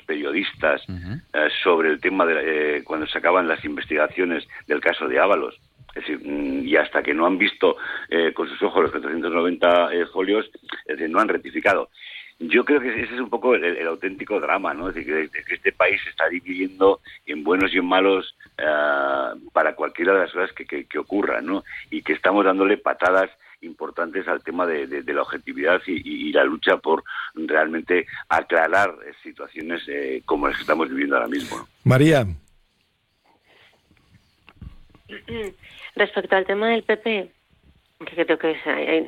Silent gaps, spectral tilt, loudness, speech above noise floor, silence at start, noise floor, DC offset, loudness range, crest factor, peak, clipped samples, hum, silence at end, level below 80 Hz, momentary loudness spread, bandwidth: none; -6 dB/octave; -21 LUFS; 45 dB; 0.1 s; -67 dBFS; under 0.1%; 4 LU; 18 dB; -4 dBFS; under 0.1%; none; 0 s; -54 dBFS; 13 LU; 14.5 kHz